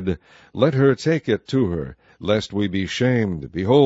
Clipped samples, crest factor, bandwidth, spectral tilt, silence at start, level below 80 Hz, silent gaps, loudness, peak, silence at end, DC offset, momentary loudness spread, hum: under 0.1%; 18 dB; 8 kHz; -7 dB/octave; 0 s; -48 dBFS; none; -21 LUFS; -2 dBFS; 0 s; under 0.1%; 13 LU; none